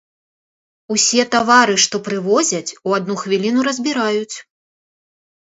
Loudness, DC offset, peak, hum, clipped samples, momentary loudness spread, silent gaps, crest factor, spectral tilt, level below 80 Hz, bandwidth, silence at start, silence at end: -16 LUFS; under 0.1%; 0 dBFS; none; under 0.1%; 10 LU; none; 18 dB; -2.5 dB/octave; -66 dBFS; 8.2 kHz; 0.9 s; 1.15 s